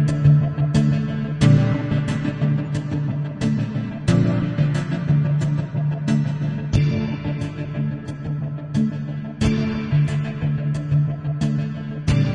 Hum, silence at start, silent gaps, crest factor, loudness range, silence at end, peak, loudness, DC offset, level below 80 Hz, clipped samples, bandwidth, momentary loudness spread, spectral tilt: none; 0 s; none; 16 dB; 3 LU; 0 s; -4 dBFS; -21 LUFS; under 0.1%; -40 dBFS; under 0.1%; 9.4 kHz; 9 LU; -8 dB/octave